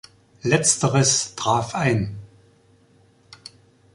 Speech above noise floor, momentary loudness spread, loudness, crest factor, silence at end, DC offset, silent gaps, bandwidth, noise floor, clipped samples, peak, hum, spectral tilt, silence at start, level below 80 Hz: 36 dB; 25 LU; -20 LUFS; 20 dB; 1.7 s; under 0.1%; none; 11.5 kHz; -57 dBFS; under 0.1%; -4 dBFS; none; -3.5 dB/octave; 0.45 s; -52 dBFS